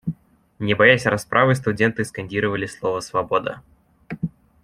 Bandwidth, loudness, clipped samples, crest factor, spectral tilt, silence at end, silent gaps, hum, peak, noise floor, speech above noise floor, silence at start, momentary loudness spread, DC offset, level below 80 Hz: 14.5 kHz; -20 LUFS; under 0.1%; 20 dB; -5.5 dB/octave; 0.35 s; none; none; -2 dBFS; -40 dBFS; 20 dB; 0.05 s; 17 LU; under 0.1%; -54 dBFS